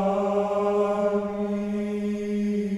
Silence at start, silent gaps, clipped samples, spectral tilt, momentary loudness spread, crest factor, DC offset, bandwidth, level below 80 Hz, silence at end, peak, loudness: 0 s; none; under 0.1%; -8 dB/octave; 5 LU; 12 dB; under 0.1%; 11.5 kHz; -58 dBFS; 0 s; -12 dBFS; -26 LUFS